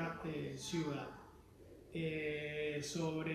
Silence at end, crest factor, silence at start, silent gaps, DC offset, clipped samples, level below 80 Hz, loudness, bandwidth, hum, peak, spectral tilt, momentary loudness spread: 0 s; 14 dB; 0 s; none; under 0.1%; under 0.1%; -66 dBFS; -42 LUFS; 14 kHz; none; -28 dBFS; -5 dB/octave; 20 LU